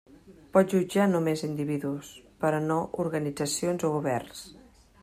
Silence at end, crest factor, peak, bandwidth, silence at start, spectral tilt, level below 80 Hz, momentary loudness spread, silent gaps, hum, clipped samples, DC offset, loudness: 0.5 s; 20 dB; -8 dBFS; 16 kHz; 0.25 s; -5.5 dB/octave; -62 dBFS; 13 LU; none; none; under 0.1%; under 0.1%; -28 LUFS